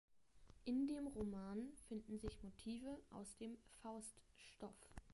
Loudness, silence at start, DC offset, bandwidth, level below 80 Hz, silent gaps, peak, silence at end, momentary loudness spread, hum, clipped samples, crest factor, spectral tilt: -51 LUFS; 0.1 s; under 0.1%; 11.5 kHz; -66 dBFS; none; -32 dBFS; 0 s; 14 LU; none; under 0.1%; 18 dB; -5.5 dB/octave